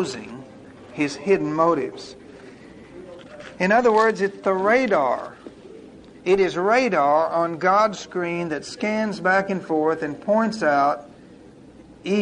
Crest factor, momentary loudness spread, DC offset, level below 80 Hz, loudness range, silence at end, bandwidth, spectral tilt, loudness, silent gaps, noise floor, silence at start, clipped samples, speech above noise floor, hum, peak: 16 dB; 21 LU; under 0.1%; -60 dBFS; 2 LU; 0 s; 10.5 kHz; -5.5 dB/octave; -21 LUFS; none; -46 dBFS; 0 s; under 0.1%; 25 dB; none; -6 dBFS